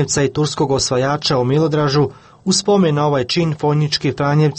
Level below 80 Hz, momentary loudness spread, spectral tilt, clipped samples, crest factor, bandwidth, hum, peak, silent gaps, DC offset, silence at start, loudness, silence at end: -46 dBFS; 4 LU; -5 dB/octave; under 0.1%; 12 dB; 8.8 kHz; none; -4 dBFS; none; under 0.1%; 0 s; -16 LUFS; 0 s